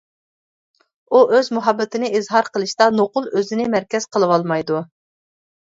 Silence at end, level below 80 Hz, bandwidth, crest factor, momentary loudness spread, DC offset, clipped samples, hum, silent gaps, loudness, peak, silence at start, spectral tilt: 0.95 s; -66 dBFS; 7.8 kHz; 18 dB; 6 LU; under 0.1%; under 0.1%; none; none; -18 LUFS; 0 dBFS; 1.1 s; -5 dB/octave